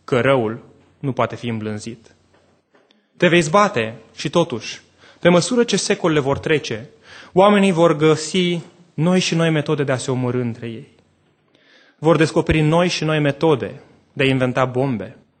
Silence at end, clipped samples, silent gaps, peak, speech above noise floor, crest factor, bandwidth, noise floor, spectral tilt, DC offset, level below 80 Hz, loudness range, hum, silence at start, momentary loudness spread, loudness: 0.3 s; under 0.1%; none; 0 dBFS; 42 dB; 18 dB; 9.2 kHz; -60 dBFS; -5.5 dB/octave; under 0.1%; -48 dBFS; 4 LU; none; 0.1 s; 15 LU; -18 LUFS